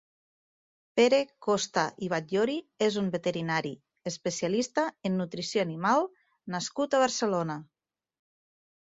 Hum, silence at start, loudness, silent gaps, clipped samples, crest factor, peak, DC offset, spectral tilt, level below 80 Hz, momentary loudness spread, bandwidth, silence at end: none; 0.95 s; -29 LUFS; none; under 0.1%; 20 dB; -10 dBFS; under 0.1%; -4.5 dB/octave; -72 dBFS; 10 LU; 8 kHz; 1.25 s